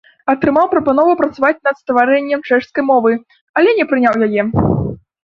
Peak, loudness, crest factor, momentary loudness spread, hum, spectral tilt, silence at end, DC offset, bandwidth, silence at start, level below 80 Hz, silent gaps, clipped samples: 0 dBFS; -14 LUFS; 14 dB; 6 LU; none; -8.5 dB/octave; 0.4 s; under 0.1%; 6.8 kHz; 0.25 s; -40 dBFS; 3.41-3.54 s; under 0.1%